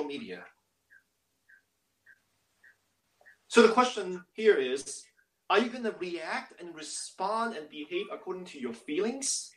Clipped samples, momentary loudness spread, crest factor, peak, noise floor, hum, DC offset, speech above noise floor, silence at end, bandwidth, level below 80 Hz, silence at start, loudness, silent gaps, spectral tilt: under 0.1%; 18 LU; 26 dB; -6 dBFS; -76 dBFS; none; under 0.1%; 46 dB; 0.05 s; 12.5 kHz; -78 dBFS; 0 s; -30 LUFS; none; -2.5 dB/octave